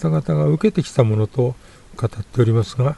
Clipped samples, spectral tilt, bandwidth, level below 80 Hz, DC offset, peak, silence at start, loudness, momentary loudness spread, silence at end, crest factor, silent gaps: under 0.1%; -8 dB/octave; 11.5 kHz; -44 dBFS; under 0.1%; -2 dBFS; 0 s; -19 LUFS; 9 LU; 0 s; 16 dB; none